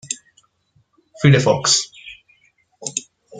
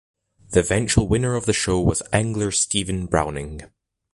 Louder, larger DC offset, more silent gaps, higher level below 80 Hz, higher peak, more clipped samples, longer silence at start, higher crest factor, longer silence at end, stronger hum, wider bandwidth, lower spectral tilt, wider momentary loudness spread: first, -17 LUFS vs -21 LUFS; neither; neither; second, -56 dBFS vs -36 dBFS; about the same, -2 dBFS vs -4 dBFS; neither; second, 0.05 s vs 0.5 s; about the same, 20 dB vs 18 dB; second, 0 s vs 0.5 s; neither; second, 9.6 kHz vs 11.5 kHz; about the same, -4 dB/octave vs -4.5 dB/octave; first, 19 LU vs 7 LU